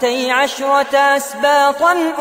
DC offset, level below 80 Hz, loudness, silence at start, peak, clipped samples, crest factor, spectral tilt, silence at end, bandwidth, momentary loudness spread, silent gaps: under 0.1%; -60 dBFS; -14 LUFS; 0 s; -2 dBFS; under 0.1%; 12 dB; -1 dB/octave; 0 s; 16 kHz; 3 LU; none